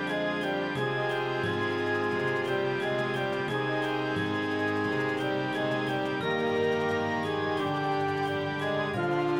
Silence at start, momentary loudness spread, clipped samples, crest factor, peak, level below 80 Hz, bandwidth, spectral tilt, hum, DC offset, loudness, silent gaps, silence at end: 0 s; 2 LU; under 0.1%; 12 dB; -16 dBFS; -66 dBFS; 16 kHz; -6 dB/octave; none; under 0.1%; -29 LUFS; none; 0 s